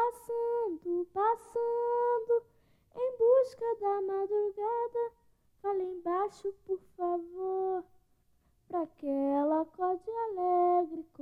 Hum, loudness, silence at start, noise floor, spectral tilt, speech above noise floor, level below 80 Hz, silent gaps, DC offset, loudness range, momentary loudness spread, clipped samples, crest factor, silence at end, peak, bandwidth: none; -32 LUFS; 0 s; -70 dBFS; -6.5 dB/octave; 38 dB; -72 dBFS; none; under 0.1%; 5 LU; 10 LU; under 0.1%; 16 dB; 0.2 s; -16 dBFS; 12.5 kHz